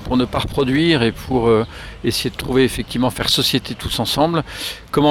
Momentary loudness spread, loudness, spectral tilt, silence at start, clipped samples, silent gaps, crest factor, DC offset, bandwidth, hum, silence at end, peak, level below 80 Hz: 7 LU; -18 LUFS; -5 dB/octave; 0 s; under 0.1%; none; 16 dB; 0.1%; 17.5 kHz; none; 0 s; -2 dBFS; -36 dBFS